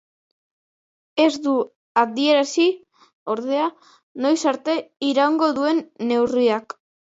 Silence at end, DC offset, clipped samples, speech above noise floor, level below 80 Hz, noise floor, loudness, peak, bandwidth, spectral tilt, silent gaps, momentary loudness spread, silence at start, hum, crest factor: 0.4 s; under 0.1%; under 0.1%; over 70 dB; -68 dBFS; under -90 dBFS; -21 LUFS; -4 dBFS; 8 kHz; -3.5 dB/octave; 1.76-1.95 s, 3.13-3.26 s, 4.03-4.15 s; 9 LU; 1.15 s; none; 18 dB